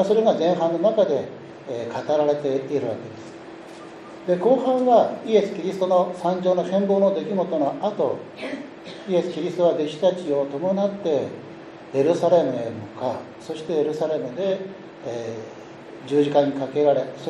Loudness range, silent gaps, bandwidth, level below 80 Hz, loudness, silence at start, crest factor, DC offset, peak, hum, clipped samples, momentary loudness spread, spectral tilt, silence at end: 5 LU; none; 10.5 kHz; -70 dBFS; -22 LUFS; 0 s; 18 dB; under 0.1%; -6 dBFS; none; under 0.1%; 19 LU; -7 dB/octave; 0 s